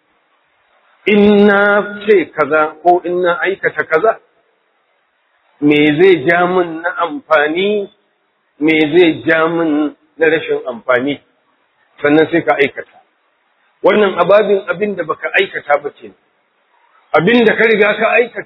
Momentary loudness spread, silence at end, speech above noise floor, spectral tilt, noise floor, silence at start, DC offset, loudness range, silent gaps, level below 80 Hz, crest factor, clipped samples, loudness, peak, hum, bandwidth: 10 LU; 0 s; 49 dB; -8.5 dB/octave; -61 dBFS; 1.05 s; under 0.1%; 3 LU; none; -56 dBFS; 14 dB; 0.2%; -13 LUFS; 0 dBFS; none; 5.4 kHz